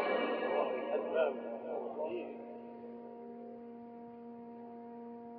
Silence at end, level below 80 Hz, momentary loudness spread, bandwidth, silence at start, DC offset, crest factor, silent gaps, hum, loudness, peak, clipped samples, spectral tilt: 0 s; -88 dBFS; 16 LU; 4.9 kHz; 0 s; under 0.1%; 18 dB; none; none; -39 LUFS; -20 dBFS; under 0.1%; -2.5 dB/octave